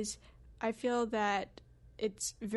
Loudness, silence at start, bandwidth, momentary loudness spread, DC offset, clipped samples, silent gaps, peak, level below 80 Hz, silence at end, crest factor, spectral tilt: -36 LUFS; 0 s; 11.5 kHz; 10 LU; under 0.1%; under 0.1%; none; -18 dBFS; -62 dBFS; 0 s; 18 dB; -3.5 dB/octave